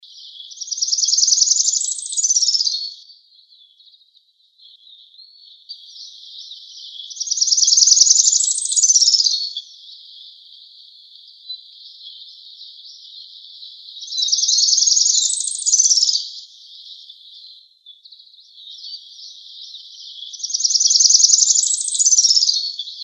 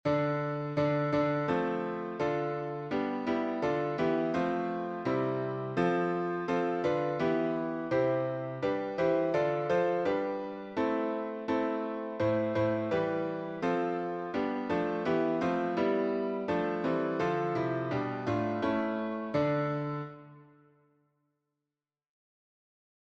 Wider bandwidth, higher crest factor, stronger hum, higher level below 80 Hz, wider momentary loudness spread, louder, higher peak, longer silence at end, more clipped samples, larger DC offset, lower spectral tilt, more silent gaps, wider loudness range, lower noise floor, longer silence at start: first, 15.5 kHz vs 7.8 kHz; about the same, 20 dB vs 16 dB; neither; second, under -90 dBFS vs -66 dBFS; first, 26 LU vs 5 LU; first, -13 LUFS vs -31 LUFS; first, 0 dBFS vs -16 dBFS; second, 0 s vs 2.65 s; neither; neither; second, 12.5 dB/octave vs -8 dB/octave; neither; first, 24 LU vs 3 LU; second, -57 dBFS vs under -90 dBFS; about the same, 0.15 s vs 0.05 s